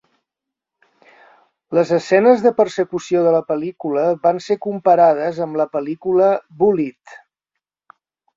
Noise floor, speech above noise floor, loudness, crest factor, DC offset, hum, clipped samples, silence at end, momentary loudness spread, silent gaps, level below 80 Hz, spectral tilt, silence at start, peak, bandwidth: -84 dBFS; 68 dB; -17 LUFS; 16 dB; under 0.1%; none; under 0.1%; 1.25 s; 9 LU; none; -64 dBFS; -6.5 dB/octave; 1.7 s; -2 dBFS; 7.6 kHz